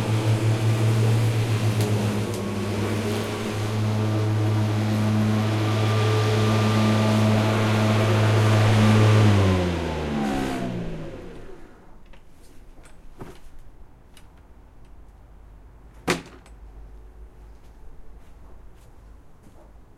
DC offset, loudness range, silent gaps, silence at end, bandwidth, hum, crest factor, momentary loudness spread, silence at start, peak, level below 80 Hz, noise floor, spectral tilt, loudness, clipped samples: under 0.1%; 17 LU; none; 0.15 s; 13.5 kHz; none; 16 dB; 12 LU; 0 s; -6 dBFS; -44 dBFS; -48 dBFS; -6.5 dB/octave; -22 LUFS; under 0.1%